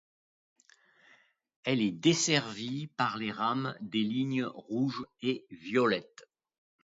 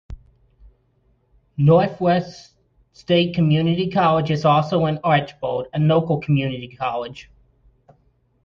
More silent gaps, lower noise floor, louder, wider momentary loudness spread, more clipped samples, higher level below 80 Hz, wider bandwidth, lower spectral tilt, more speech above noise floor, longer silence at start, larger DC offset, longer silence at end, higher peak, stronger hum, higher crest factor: neither; about the same, -65 dBFS vs -62 dBFS; second, -31 LUFS vs -19 LUFS; second, 9 LU vs 12 LU; neither; second, -76 dBFS vs -50 dBFS; first, 7.8 kHz vs 6.8 kHz; second, -4 dB/octave vs -8 dB/octave; second, 33 dB vs 43 dB; first, 1.65 s vs 0.1 s; neither; second, 0.8 s vs 1.2 s; second, -10 dBFS vs -4 dBFS; neither; about the same, 22 dB vs 18 dB